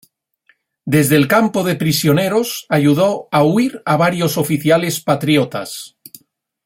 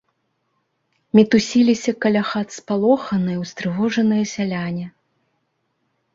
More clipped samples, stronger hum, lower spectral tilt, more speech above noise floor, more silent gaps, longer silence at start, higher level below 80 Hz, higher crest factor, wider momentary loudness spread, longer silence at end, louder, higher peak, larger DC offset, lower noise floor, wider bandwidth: neither; neither; about the same, -5.5 dB/octave vs -6 dB/octave; second, 44 dB vs 52 dB; neither; second, 0.85 s vs 1.15 s; about the same, -54 dBFS vs -58 dBFS; about the same, 16 dB vs 18 dB; about the same, 8 LU vs 10 LU; second, 0.8 s vs 1.25 s; first, -15 LUFS vs -19 LUFS; about the same, 0 dBFS vs -2 dBFS; neither; second, -59 dBFS vs -70 dBFS; first, 16.5 kHz vs 7.8 kHz